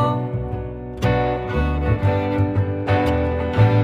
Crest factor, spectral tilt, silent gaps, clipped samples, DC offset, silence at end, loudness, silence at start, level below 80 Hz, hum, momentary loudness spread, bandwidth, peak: 16 dB; -8.5 dB/octave; none; under 0.1%; under 0.1%; 0 s; -21 LUFS; 0 s; -30 dBFS; none; 8 LU; 6.8 kHz; -4 dBFS